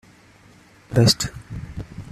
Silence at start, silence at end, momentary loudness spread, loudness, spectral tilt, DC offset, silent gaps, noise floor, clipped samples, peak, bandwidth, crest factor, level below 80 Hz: 0.9 s; 0.05 s; 19 LU; -19 LUFS; -4.5 dB/octave; under 0.1%; none; -51 dBFS; under 0.1%; -2 dBFS; 14 kHz; 22 dB; -44 dBFS